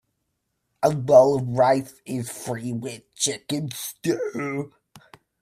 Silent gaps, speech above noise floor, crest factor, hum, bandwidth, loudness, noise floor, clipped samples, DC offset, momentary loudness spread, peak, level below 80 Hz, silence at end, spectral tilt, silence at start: none; 54 dB; 22 dB; none; 16 kHz; -23 LUFS; -76 dBFS; under 0.1%; under 0.1%; 16 LU; -2 dBFS; -64 dBFS; 0.45 s; -5 dB/octave; 0.8 s